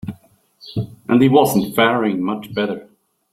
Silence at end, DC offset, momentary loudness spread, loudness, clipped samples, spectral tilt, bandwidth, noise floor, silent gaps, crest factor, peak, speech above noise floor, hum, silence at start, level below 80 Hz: 0.5 s; under 0.1%; 15 LU; -17 LUFS; under 0.1%; -6 dB/octave; 16.5 kHz; -51 dBFS; none; 16 dB; -2 dBFS; 35 dB; none; 0.05 s; -54 dBFS